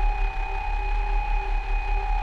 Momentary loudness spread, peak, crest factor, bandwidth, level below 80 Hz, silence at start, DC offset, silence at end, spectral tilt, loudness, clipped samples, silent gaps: 2 LU; -14 dBFS; 10 dB; 5.2 kHz; -24 dBFS; 0 s; under 0.1%; 0 s; -5.5 dB/octave; -29 LUFS; under 0.1%; none